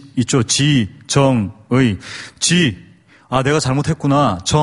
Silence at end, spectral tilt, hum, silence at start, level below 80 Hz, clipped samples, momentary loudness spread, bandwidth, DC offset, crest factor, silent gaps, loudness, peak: 0 s; -4.5 dB/octave; none; 0.05 s; -42 dBFS; under 0.1%; 6 LU; 11.5 kHz; under 0.1%; 16 dB; none; -16 LUFS; 0 dBFS